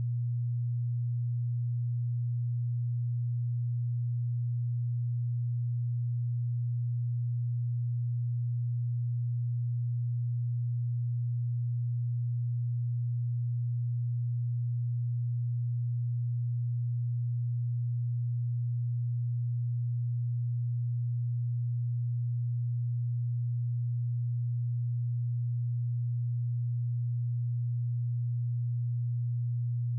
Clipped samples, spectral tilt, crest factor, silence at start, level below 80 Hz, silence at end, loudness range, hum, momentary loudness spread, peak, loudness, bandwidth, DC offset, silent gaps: under 0.1%; -32.5 dB/octave; 4 dB; 0 s; -84 dBFS; 0 s; 0 LU; none; 0 LU; -28 dBFS; -33 LUFS; 0.2 kHz; under 0.1%; none